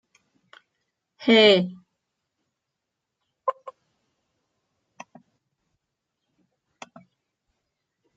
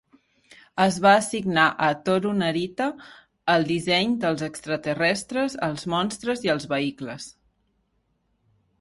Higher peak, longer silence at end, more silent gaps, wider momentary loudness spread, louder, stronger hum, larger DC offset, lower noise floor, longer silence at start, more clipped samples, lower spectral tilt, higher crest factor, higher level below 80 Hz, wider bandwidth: about the same, -6 dBFS vs -4 dBFS; first, 4.45 s vs 1.5 s; neither; first, 18 LU vs 11 LU; first, -20 LUFS vs -23 LUFS; neither; neither; first, -83 dBFS vs -71 dBFS; first, 1.2 s vs 0.75 s; neither; about the same, -5 dB/octave vs -4.5 dB/octave; about the same, 24 dB vs 22 dB; second, -78 dBFS vs -62 dBFS; second, 7.8 kHz vs 11.5 kHz